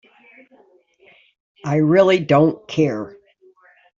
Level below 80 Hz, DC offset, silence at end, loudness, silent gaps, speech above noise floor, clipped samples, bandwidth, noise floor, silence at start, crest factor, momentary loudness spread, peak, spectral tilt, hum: -60 dBFS; under 0.1%; 0.9 s; -17 LUFS; none; 39 dB; under 0.1%; 7.6 kHz; -55 dBFS; 1.65 s; 18 dB; 16 LU; -2 dBFS; -7.5 dB/octave; none